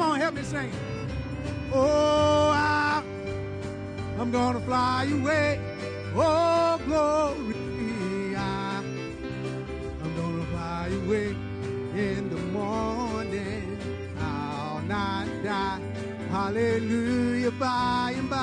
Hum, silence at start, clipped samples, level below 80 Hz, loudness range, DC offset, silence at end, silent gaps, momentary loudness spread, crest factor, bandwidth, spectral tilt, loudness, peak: none; 0 s; under 0.1%; -46 dBFS; 6 LU; under 0.1%; 0 s; none; 12 LU; 16 dB; 10.5 kHz; -6 dB/octave; -28 LUFS; -12 dBFS